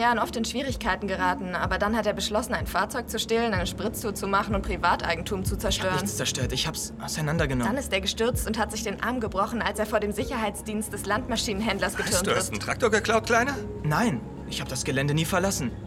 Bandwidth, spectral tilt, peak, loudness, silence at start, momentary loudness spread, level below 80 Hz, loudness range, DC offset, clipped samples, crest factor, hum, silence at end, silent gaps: 16.5 kHz; -4 dB/octave; -6 dBFS; -26 LUFS; 0 s; 6 LU; -40 dBFS; 2 LU; under 0.1%; under 0.1%; 20 dB; none; 0 s; none